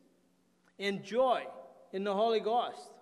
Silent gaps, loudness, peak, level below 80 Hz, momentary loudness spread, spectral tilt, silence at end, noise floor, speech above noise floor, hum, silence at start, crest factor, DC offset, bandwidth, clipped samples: none; -33 LUFS; -18 dBFS; -80 dBFS; 13 LU; -5 dB/octave; 0.1 s; -71 dBFS; 39 dB; none; 0.8 s; 16 dB; under 0.1%; 12 kHz; under 0.1%